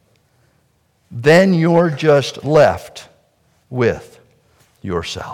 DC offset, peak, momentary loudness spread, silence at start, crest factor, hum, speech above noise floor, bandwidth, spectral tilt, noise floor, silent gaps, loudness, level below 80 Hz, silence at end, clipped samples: under 0.1%; -2 dBFS; 21 LU; 1.1 s; 16 dB; none; 46 dB; 15 kHz; -6.5 dB/octave; -60 dBFS; none; -15 LUFS; -52 dBFS; 0 s; under 0.1%